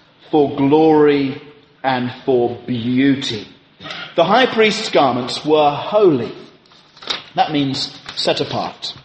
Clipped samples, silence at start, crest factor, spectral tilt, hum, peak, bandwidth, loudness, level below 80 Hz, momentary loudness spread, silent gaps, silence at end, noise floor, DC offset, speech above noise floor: under 0.1%; 0.3 s; 16 dB; -5.5 dB/octave; none; 0 dBFS; 8.8 kHz; -16 LUFS; -58 dBFS; 12 LU; none; 0.05 s; -47 dBFS; under 0.1%; 32 dB